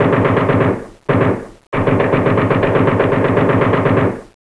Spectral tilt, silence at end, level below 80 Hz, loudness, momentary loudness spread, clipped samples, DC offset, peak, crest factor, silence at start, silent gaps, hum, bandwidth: -8.5 dB/octave; 0.3 s; -36 dBFS; -15 LUFS; 6 LU; under 0.1%; under 0.1%; 0 dBFS; 14 dB; 0 s; 1.67-1.72 s; none; 11 kHz